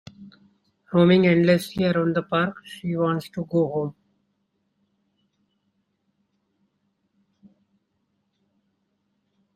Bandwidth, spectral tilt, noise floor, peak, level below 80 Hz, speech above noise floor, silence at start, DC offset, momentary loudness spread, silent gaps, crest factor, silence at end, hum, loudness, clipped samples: 14 kHz; -7.5 dB/octave; -73 dBFS; -6 dBFS; -62 dBFS; 52 dB; 0.2 s; under 0.1%; 12 LU; none; 20 dB; 5.65 s; none; -22 LUFS; under 0.1%